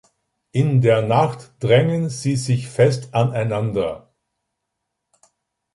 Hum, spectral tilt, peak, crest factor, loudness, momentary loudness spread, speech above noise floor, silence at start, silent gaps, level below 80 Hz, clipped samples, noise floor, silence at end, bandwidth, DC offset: none; -6.5 dB/octave; -2 dBFS; 18 dB; -19 LUFS; 9 LU; 60 dB; 0.55 s; none; -54 dBFS; under 0.1%; -78 dBFS; 1.75 s; 11.5 kHz; under 0.1%